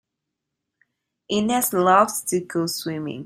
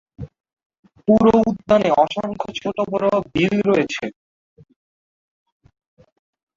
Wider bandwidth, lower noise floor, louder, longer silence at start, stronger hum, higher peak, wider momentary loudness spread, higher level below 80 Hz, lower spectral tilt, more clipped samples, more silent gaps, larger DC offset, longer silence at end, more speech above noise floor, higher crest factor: first, 16 kHz vs 7.6 kHz; second, -82 dBFS vs under -90 dBFS; second, -21 LUFS vs -18 LUFS; first, 1.3 s vs 0.2 s; neither; about the same, -2 dBFS vs -2 dBFS; second, 10 LU vs 15 LU; second, -64 dBFS vs -50 dBFS; second, -4 dB/octave vs -6.5 dB/octave; neither; second, none vs 0.53-0.57 s, 0.66-0.70 s, 0.79-0.83 s; neither; second, 0 s vs 2.45 s; second, 61 dB vs over 72 dB; about the same, 20 dB vs 18 dB